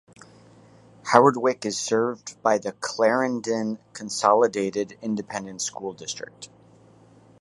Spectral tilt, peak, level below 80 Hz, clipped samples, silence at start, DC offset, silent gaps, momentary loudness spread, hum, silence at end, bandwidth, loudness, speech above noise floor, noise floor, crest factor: -4 dB/octave; 0 dBFS; -70 dBFS; under 0.1%; 1.05 s; under 0.1%; none; 15 LU; none; 0.95 s; 11.5 kHz; -24 LUFS; 29 dB; -53 dBFS; 24 dB